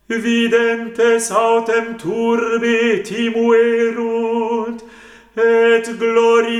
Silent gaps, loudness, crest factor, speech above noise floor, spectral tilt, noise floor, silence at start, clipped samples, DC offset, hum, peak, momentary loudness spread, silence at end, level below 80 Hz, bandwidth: none; -16 LUFS; 14 dB; 26 dB; -3.5 dB/octave; -41 dBFS; 0.1 s; under 0.1%; under 0.1%; none; -2 dBFS; 7 LU; 0 s; -60 dBFS; 13 kHz